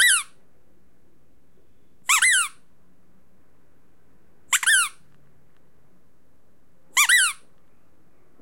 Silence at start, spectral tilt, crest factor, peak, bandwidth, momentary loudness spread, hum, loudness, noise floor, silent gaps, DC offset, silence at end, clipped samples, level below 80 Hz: 0 s; 4.5 dB/octave; 24 dB; -2 dBFS; 16.5 kHz; 14 LU; none; -19 LUFS; -63 dBFS; none; 0.6%; 1.1 s; under 0.1%; -72 dBFS